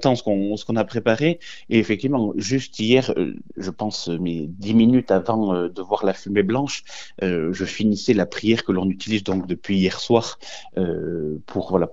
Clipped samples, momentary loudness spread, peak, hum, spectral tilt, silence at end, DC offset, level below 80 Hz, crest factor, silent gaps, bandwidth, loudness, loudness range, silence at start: under 0.1%; 9 LU; -2 dBFS; none; -6 dB/octave; 0 s; 0.9%; -52 dBFS; 20 dB; none; 8 kHz; -22 LUFS; 2 LU; 0 s